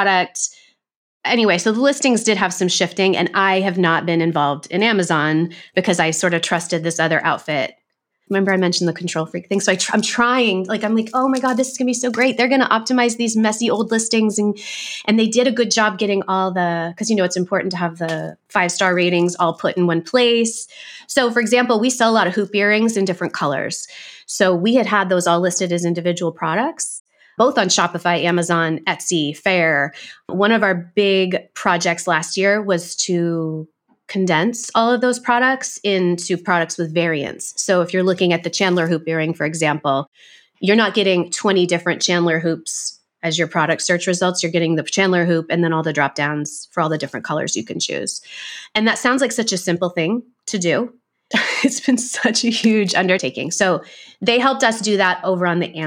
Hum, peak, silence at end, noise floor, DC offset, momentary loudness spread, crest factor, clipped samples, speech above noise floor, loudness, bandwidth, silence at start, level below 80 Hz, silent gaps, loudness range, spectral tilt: none; -2 dBFS; 0 s; -68 dBFS; under 0.1%; 8 LU; 16 dB; under 0.1%; 50 dB; -18 LUFS; 16 kHz; 0 s; -68 dBFS; 0.96-1.21 s, 27.00-27.05 s, 40.07-40.12 s; 2 LU; -4 dB/octave